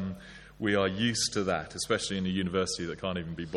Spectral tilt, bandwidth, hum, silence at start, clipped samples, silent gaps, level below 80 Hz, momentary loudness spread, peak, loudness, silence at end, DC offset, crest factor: -4 dB/octave; 13.5 kHz; none; 0 s; under 0.1%; none; -56 dBFS; 8 LU; -12 dBFS; -30 LUFS; 0 s; under 0.1%; 18 dB